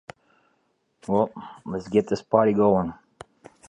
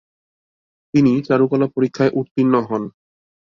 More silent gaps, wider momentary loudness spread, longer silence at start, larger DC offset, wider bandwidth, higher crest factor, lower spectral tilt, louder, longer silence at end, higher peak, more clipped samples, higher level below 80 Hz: second, none vs 2.31-2.35 s; first, 14 LU vs 8 LU; first, 1.1 s vs 0.95 s; neither; first, 10.5 kHz vs 7.2 kHz; first, 22 dB vs 16 dB; about the same, -8 dB/octave vs -8 dB/octave; second, -23 LUFS vs -18 LUFS; first, 0.75 s vs 0.55 s; about the same, -4 dBFS vs -2 dBFS; neither; about the same, -56 dBFS vs -58 dBFS